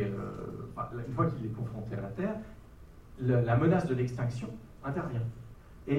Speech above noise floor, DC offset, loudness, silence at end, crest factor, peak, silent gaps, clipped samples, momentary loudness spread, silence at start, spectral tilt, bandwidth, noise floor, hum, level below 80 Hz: 21 dB; under 0.1%; -33 LUFS; 0 s; 18 dB; -14 dBFS; none; under 0.1%; 16 LU; 0 s; -9 dB/octave; 9.2 kHz; -52 dBFS; none; -54 dBFS